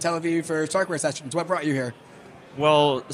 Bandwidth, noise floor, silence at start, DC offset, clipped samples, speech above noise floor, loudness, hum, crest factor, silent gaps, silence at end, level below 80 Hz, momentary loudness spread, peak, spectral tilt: 14.5 kHz; -46 dBFS; 0 s; under 0.1%; under 0.1%; 22 dB; -24 LUFS; none; 18 dB; none; 0 s; -68 dBFS; 9 LU; -6 dBFS; -4.5 dB/octave